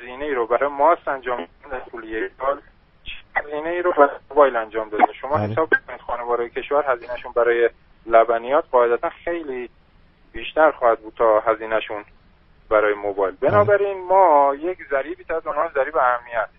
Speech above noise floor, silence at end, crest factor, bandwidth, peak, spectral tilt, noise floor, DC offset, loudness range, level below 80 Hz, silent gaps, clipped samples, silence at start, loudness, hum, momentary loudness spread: 33 dB; 0.15 s; 20 dB; 5.4 kHz; 0 dBFS; -3.5 dB/octave; -53 dBFS; under 0.1%; 5 LU; -50 dBFS; none; under 0.1%; 0 s; -20 LUFS; none; 14 LU